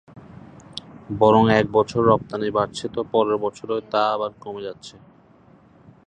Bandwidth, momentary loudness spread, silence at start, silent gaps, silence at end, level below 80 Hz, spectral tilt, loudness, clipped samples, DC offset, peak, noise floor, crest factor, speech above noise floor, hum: 9.6 kHz; 21 LU; 0.15 s; none; 1.15 s; -52 dBFS; -6.5 dB/octave; -20 LUFS; under 0.1%; under 0.1%; -2 dBFS; -52 dBFS; 20 dB; 32 dB; none